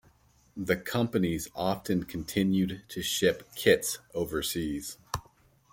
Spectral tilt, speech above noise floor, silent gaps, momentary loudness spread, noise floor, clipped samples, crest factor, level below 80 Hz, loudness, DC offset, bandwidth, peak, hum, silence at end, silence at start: -4.5 dB/octave; 34 dB; none; 12 LU; -63 dBFS; under 0.1%; 22 dB; -54 dBFS; -30 LUFS; under 0.1%; 17 kHz; -8 dBFS; none; 0.5 s; 0.55 s